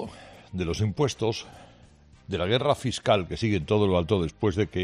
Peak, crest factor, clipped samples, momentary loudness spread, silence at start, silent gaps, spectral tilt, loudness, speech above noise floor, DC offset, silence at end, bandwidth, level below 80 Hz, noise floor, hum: -8 dBFS; 18 dB; under 0.1%; 13 LU; 0 s; none; -6 dB/octave; -26 LUFS; 28 dB; under 0.1%; 0 s; 11.5 kHz; -50 dBFS; -54 dBFS; none